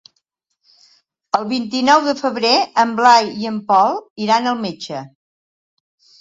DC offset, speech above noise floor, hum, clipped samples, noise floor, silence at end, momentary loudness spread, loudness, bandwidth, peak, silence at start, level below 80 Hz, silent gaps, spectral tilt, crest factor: under 0.1%; 54 dB; none; under 0.1%; -70 dBFS; 1.15 s; 12 LU; -16 LUFS; 7.8 kHz; 0 dBFS; 1.35 s; -66 dBFS; 4.10-4.16 s; -3.5 dB/octave; 18 dB